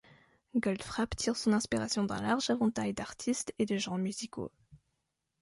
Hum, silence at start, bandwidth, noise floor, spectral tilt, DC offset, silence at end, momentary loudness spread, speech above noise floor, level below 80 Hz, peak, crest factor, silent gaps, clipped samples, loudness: none; 0.55 s; 11.5 kHz; -83 dBFS; -4.5 dB/octave; under 0.1%; 0.65 s; 7 LU; 50 dB; -58 dBFS; -16 dBFS; 18 dB; none; under 0.1%; -33 LUFS